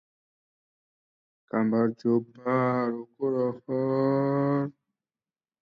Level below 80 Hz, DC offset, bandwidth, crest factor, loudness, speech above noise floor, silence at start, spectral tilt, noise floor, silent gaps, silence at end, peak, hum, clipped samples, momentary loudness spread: -76 dBFS; under 0.1%; 5.6 kHz; 14 dB; -27 LUFS; over 64 dB; 1.55 s; -10.5 dB/octave; under -90 dBFS; none; 0.9 s; -14 dBFS; none; under 0.1%; 6 LU